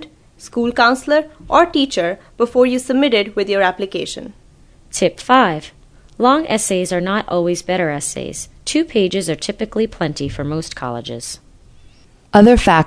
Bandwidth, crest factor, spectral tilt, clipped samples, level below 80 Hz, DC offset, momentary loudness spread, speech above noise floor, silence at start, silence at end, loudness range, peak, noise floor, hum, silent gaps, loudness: 11 kHz; 16 dB; -4.5 dB/octave; under 0.1%; -36 dBFS; under 0.1%; 13 LU; 30 dB; 0 s; 0 s; 5 LU; 0 dBFS; -46 dBFS; none; none; -16 LUFS